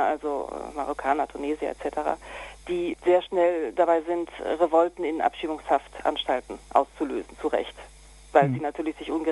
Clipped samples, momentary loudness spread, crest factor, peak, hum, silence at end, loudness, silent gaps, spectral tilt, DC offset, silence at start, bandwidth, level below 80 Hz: under 0.1%; 10 LU; 22 dB; -4 dBFS; none; 0 s; -26 LUFS; none; -6 dB/octave; under 0.1%; 0 s; 12 kHz; -54 dBFS